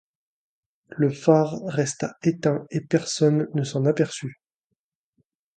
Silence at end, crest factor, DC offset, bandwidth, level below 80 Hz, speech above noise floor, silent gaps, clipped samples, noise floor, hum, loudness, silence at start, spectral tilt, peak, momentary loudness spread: 1.25 s; 22 dB; under 0.1%; 9.4 kHz; -68 dBFS; 59 dB; none; under 0.1%; -81 dBFS; none; -23 LUFS; 0.9 s; -6 dB/octave; -4 dBFS; 8 LU